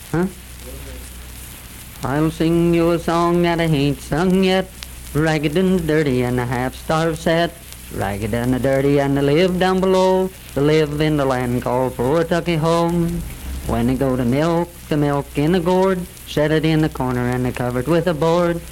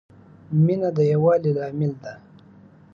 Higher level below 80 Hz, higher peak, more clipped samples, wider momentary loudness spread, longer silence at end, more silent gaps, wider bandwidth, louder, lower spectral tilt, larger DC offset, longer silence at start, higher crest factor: first, -36 dBFS vs -64 dBFS; first, -4 dBFS vs -8 dBFS; neither; first, 14 LU vs 11 LU; second, 0 s vs 0.75 s; neither; first, 17 kHz vs 6.6 kHz; first, -18 LUFS vs -21 LUFS; second, -6.5 dB/octave vs -10 dB/octave; neither; second, 0 s vs 0.5 s; about the same, 14 dB vs 16 dB